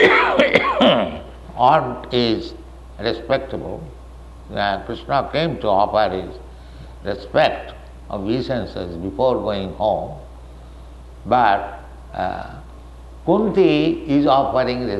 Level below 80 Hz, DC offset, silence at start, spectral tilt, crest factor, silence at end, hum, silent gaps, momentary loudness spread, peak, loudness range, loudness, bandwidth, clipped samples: -40 dBFS; under 0.1%; 0 s; -6.5 dB/octave; 18 dB; 0 s; none; none; 21 LU; -2 dBFS; 5 LU; -19 LUFS; 12 kHz; under 0.1%